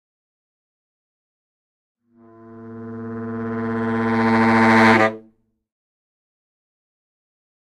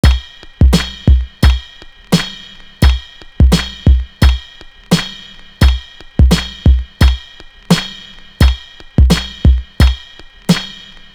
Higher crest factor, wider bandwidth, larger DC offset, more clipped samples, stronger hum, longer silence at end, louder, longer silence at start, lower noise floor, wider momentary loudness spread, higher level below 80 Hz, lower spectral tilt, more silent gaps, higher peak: first, 22 dB vs 12 dB; second, 10.5 kHz vs 14 kHz; neither; neither; neither; first, 2.6 s vs 0.45 s; second, -17 LUFS vs -14 LUFS; first, 2.45 s vs 0.05 s; first, -56 dBFS vs -36 dBFS; first, 22 LU vs 14 LU; second, -60 dBFS vs -14 dBFS; about the same, -6.5 dB/octave vs -5.5 dB/octave; neither; about the same, -2 dBFS vs 0 dBFS